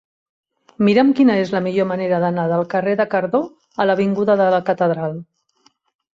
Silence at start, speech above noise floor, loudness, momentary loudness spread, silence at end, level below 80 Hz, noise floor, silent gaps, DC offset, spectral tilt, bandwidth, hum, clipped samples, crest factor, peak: 0.8 s; 43 dB; -18 LUFS; 8 LU; 0.9 s; -62 dBFS; -60 dBFS; none; under 0.1%; -8 dB/octave; 7.6 kHz; none; under 0.1%; 16 dB; -2 dBFS